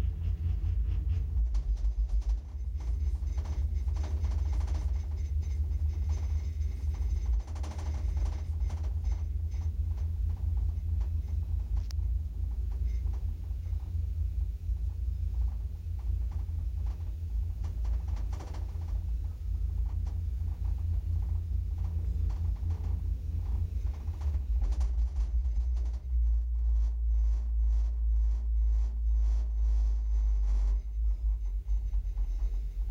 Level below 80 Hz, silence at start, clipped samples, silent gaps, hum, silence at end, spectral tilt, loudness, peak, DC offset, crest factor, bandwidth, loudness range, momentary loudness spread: -30 dBFS; 0 s; under 0.1%; none; none; 0 s; -7.5 dB/octave; -34 LUFS; -22 dBFS; under 0.1%; 8 dB; 6.6 kHz; 4 LU; 5 LU